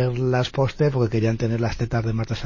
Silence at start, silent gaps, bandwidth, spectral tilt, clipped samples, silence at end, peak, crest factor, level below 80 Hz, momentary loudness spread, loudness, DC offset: 0 s; none; 7.4 kHz; -7.5 dB/octave; under 0.1%; 0 s; -8 dBFS; 14 dB; -42 dBFS; 3 LU; -23 LUFS; under 0.1%